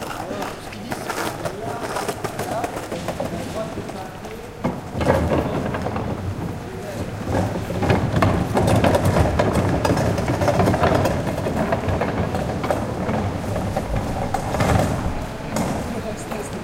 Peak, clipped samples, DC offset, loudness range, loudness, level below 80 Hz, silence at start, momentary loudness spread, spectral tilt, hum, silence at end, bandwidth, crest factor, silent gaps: -2 dBFS; under 0.1%; under 0.1%; 8 LU; -23 LUFS; -34 dBFS; 0 s; 11 LU; -6 dB/octave; none; 0 s; 16.5 kHz; 20 dB; none